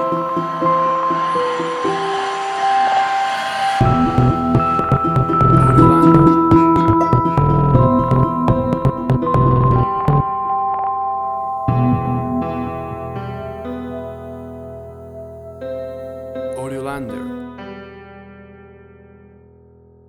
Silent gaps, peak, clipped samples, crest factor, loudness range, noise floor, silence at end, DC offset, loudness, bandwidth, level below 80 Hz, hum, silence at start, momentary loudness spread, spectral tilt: none; 0 dBFS; under 0.1%; 16 dB; 17 LU; -47 dBFS; 1.4 s; under 0.1%; -16 LUFS; 11.5 kHz; -34 dBFS; none; 0 s; 19 LU; -8 dB/octave